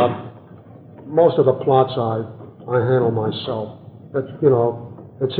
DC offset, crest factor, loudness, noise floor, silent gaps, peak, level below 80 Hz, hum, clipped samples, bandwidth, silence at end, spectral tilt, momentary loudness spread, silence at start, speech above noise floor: under 0.1%; 18 dB; -19 LUFS; -42 dBFS; none; -2 dBFS; -64 dBFS; none; under 0.1%; 4.7 kHz; 0 s; -11.5 dB/octave; 18 LU; 0 s; 24 dB